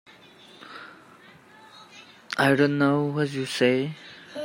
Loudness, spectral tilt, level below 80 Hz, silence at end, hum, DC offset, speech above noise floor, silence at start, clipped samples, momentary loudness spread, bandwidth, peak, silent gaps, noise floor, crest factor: -23 LUFS; -6 dB/octave; -70 dBFS; 0 s; none; under 0.1%; 29 dB; 0.6 s; under 0.1%; 25 LU; 16 kHz; -8 dBFS; none; -51 dBFS; 20 dB